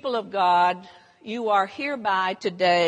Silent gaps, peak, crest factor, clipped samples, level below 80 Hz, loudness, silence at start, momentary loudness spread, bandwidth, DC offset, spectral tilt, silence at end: none; -8 dBFS; 16 dB; under 0.1%; -76 dBFS; -23 LUFS; 0.05 s; 13 LU; 11 kHz; under 0.1%; -4.5 dB/octave; 0 s